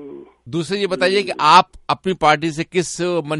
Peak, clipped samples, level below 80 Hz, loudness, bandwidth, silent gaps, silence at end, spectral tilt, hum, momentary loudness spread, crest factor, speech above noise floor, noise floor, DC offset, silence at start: 0 dBFS; under 0.1%; -52 dBFS; -17 LUFS; 11.5 kHz; none; 0 s; -4 dB/octave; none; 12 LU; 18 dB; 20 dB; -37 dBFS; under 0.1%; 0 s